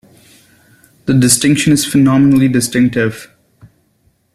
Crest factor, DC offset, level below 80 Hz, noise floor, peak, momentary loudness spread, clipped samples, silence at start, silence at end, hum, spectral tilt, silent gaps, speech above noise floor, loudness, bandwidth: 14 dB; under 0.1%; -46 dBFS; -57 dBFS; 0 dBFS; 9 LU; under 0.1%; 1.05 s; 1.1 s; none; -4.5 dB/octave; none; 47 dB; -11 LUFS; 14.5 kHz